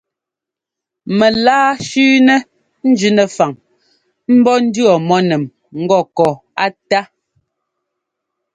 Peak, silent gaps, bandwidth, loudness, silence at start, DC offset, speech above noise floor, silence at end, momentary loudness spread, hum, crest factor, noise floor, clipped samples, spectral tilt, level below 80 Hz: 0 dBFS; none; 9.2 kHz; -13 LUFS; 1.05 s; under 0.1%; 72 dB; 1.5 s; 9 LU; none; 14 dB; -84 dBFS; under 0.1%; -5 dB/octave; -58 dBFS